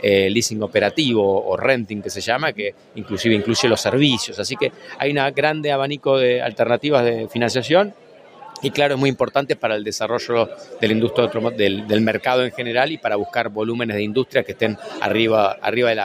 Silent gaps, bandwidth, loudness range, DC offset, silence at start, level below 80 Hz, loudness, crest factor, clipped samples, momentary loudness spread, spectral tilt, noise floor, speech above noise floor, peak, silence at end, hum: none; 15.5 kHz; 2 LU; under 0.1%; 0 s; -60 dBFS; -19 LUFS; 18 dB; under 0.1%; 7 LU; -4.5 dB/octave; -42 dBFS; 23 dB; -2 dBFS; 0 s; none